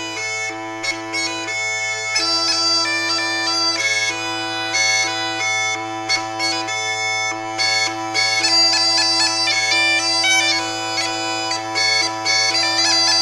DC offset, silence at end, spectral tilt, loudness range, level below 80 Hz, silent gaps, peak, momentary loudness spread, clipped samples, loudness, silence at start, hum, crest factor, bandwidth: under 0.1%; 0 s; 0 dB/octave; 4 LU; -60 dBFS; none; -4 dBFS; 8 LU; under 0.1%; -17 LUFS; 0 s; none; 14 dB; 14.5 kHz